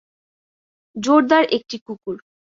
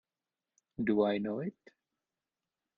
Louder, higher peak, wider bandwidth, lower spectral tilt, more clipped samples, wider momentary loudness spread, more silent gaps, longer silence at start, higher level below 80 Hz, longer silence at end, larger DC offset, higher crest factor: first, -17 LUFS vs -33 LUFS; first, -2 dBFS vs -16 dBFS; first, 7.8 kHz vs 6.4 kHz; second, -4 dB/octave vs -8.5 dB/octave; neither; first, 19 LU vs 13 LU; first, 1.81-1.86 s vs none; first, 0.95 s vs 0.8 s; first, -66 dBFS vs -72 dBFS; second, 0.4 s vs 1.25 s; neither; about the same, 20 dB vs 20 dB